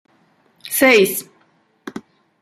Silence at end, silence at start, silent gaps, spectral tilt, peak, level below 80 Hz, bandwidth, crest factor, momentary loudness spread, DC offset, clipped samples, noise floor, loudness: 0.4 s; 0.65 s; none; -3 dB/octave; 0 dBFS; -66 dBFS; 16 kHz; 20 dB; 26 LU; under 0.1%; under 0.1%; -59 dBFS; -15 LUFS